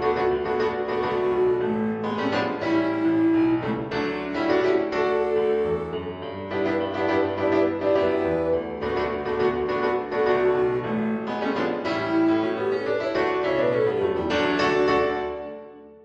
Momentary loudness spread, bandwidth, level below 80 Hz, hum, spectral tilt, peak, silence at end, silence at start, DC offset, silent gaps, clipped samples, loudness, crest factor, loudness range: 6 LU; 7.8 kHz; -52 dBFS; none; -7 dB/octave; -8 dBFS; 0.1 s; 0 s; under 0.1%; none; under 0.1%; -24 LUFS; 14 dB; 1 LU